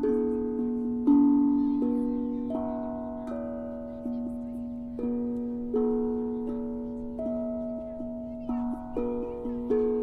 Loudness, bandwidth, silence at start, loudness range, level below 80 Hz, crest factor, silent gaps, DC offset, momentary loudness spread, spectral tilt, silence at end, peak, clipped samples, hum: -30 LUFS; 3.3 kHz; 0 s; 7 LU; -50 dBFS; 16 dB; none; under 0.1%; 12 LU; -10 dB/octave; 0 s; -12 dBFS; under 0.1%; none